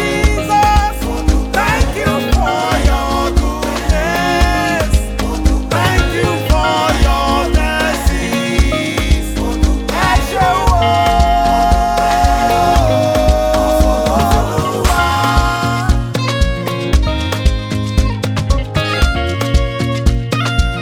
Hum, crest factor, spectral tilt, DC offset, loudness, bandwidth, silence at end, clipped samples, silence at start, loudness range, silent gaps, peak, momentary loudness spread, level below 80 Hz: none; 12 dB; -5 dB/octave; under 0.1%; -14 LUFS; 18 kHz; 0 s; under 0.1%; 0 s; 4 LU; none; 0 dBFS; 5 LU; -18 dBFS